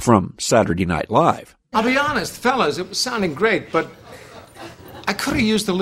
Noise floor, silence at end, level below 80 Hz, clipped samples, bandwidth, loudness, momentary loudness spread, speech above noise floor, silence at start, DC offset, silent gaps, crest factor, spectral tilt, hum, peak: -39 dBFS; 0 s; -46 dBFS; under 0.1%; 16 kHz; -19 LUFS; 19 LU; 20 dB; 0 s; under 0.1%; none; 18 dB; -4.5 dB/octave; none; 0 dBFS